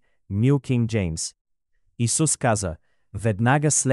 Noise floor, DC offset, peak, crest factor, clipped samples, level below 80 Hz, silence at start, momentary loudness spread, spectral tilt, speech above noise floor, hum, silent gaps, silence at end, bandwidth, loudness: -68 dBFS; under 0.1%; -8 dBFS; 16 dB; under 0.1%; -48 dBFS; 0.3 s; 12 LU; -5 dB/octave; 47 dB; none; 1.41-1.45 s; 0 s; 12 kHz; -23 LUFS